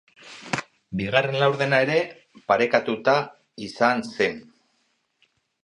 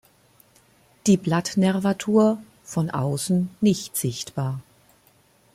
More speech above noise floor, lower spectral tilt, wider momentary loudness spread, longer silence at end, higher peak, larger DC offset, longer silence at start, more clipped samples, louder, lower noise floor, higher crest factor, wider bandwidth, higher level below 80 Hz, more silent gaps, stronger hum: first, 48 dB vs 37 dB; about the same, -5.5 dB/octave vs -6 dB/octave; first, 17 LU vs 10 LU; first, 1.25 s vs 0.95 s; first, -2 dBFS vs -8 dBFS; neither; second, 0.25 s vs 1.05 s; neither; about the same, -23 LUFS vs -23 LUFS; first, -70 dBFS vs -59 dBFS; about the same, 22 dB vs 18 dB; second, 11 kHz vs 15.5 kHz; about the same, -62 dBFS vs -62 dBFS; neither; neither